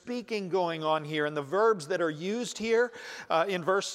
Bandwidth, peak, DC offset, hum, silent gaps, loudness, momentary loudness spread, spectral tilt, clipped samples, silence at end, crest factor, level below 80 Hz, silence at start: 13.5 kHz; -12 dBFS; under 0.1%; none; none; -29 LUFS; 7 LU; -4.5 dB/octave; under 0.1%; 0 s; 16 dB; -74 dBFS; 0.05 s